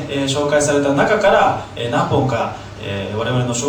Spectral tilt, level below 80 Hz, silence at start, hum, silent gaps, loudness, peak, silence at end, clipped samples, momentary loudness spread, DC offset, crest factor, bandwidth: -4.5 dB/octave; -44 dBFS; 0 s; none; none; -17 LUFS; 0 dBFS; 0 s; under 0.1%; 11 LU; under 0.1%; 16 dB; over 20 kHz